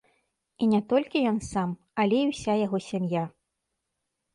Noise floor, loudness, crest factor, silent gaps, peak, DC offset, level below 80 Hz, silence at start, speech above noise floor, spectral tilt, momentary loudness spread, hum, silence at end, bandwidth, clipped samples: -82 dBFS; -27 LUFS; 16 dB; none; -12 dBFS; under 0.1%; -58 dBFS; 0.6 s; 56 dB; -6.5 dB/octave; 6 LU; none; 1.05 s; 11.5 kHz; under 0.1%